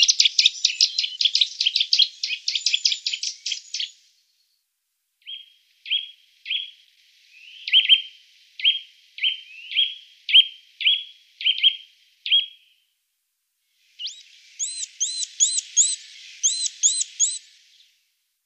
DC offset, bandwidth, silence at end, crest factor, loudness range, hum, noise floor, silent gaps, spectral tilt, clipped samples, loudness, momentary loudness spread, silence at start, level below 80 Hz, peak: under 0.1%; 15.5 kHz; 1.1 s; 22 dB; 11 LU; none; -76 dBFS; none; 12.5 dB/octave; under 0.1%; -20 LUFS; 19 LU; 0 s; under -90 dBFS; -2 dBFS